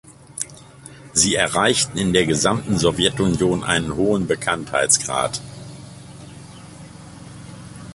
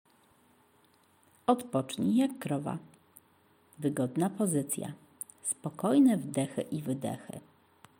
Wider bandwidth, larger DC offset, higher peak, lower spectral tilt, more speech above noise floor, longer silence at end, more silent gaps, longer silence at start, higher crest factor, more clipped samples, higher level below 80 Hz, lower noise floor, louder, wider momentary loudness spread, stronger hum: second, 12 kHz vs 17 kHz; neither; first, 0 dBFS vs -12 dBFS; second, -3.5 dB/octave vs -5.5 dB/octave; second, 23 dB vs 35 dB; second, 0 s vs 0.6 s; neither; second, 0.05 s vs 1.5 s; about the same, 20 dB vs 22 dB; neither; first, -44 dBFS vs -78 dBFS; second, -42 dBFS vs -66 dBFS; first, -19 LUFS vs -31 LUFS; first, 23 LU vs 17 LU; neither